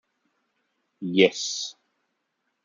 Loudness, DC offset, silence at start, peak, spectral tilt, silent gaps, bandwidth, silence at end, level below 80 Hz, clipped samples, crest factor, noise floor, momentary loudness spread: -23 LUFS; under 0.1%; 1 s; -4 dBFS; -3.5 dB/octave; none; 9.4 kHz; 0.95 s; -78 dBFS; under 0.1%; 24 dB; -77 dBFS; 15 LU